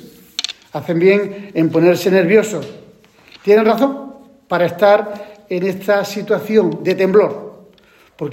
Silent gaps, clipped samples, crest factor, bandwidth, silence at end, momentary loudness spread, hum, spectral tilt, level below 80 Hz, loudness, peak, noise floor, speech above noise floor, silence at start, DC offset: none; under 0.1%; 16 dB; 16.5 kHz; 0 s; 16 LU; none; -6 dB/octave; -62 dBFS; -15 LUFS; 0 dBFS; -49 dBFS; 35 dB; 0.05 s; under 0.1%